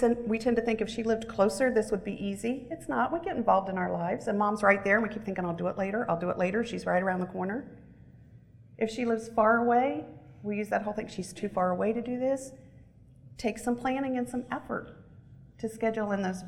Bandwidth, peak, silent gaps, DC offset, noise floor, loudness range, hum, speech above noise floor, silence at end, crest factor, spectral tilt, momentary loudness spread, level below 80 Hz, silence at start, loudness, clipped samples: 13 kHz; -8 dBFS; none; under 0.1%; -54 dBFS; 5 LU; none; 25 dB; 0 s; 22 dB; -6 dB/octave; 11 LU; -58 dBFS; 0 s; -30 LUFS; under 0.1%